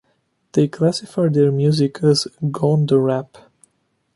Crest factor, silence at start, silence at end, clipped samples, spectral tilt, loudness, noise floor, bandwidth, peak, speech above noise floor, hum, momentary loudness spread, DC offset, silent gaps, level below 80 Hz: 16 dB; 0.55 s; 0.9 s; under 0.1%; -7 dB/octave; -18 LUFS; -67 dBFS; 11.5 kHz; -4 dBFS; 50 dB; none; 6 LU; under 0.1%; none; -60 dBFS